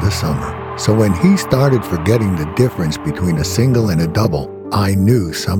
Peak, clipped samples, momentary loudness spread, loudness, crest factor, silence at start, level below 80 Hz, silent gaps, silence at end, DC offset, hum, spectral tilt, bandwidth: 0 dBFS; under 0.1%; 7 LU; -16 LUFS; 14 dB; 0 s; -34 dBFS; none; 0 s; under 0.1%; none; -6.5 dB/octave; 18 kHz